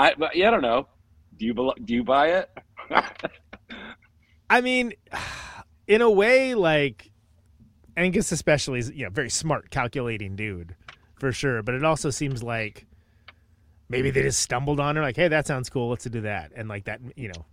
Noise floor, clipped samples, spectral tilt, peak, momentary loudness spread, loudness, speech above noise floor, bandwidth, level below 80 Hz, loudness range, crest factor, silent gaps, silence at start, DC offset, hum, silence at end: -60 dBFS; under 0.1%; -4.5 dB/octave; -2 dBFS; 17 LU; -24 LUFS; 36 dB; 16 kHz; -50 dBFS; 6 LU; 24 dB; none; 0 s; under 0.1%; none; 0.1 s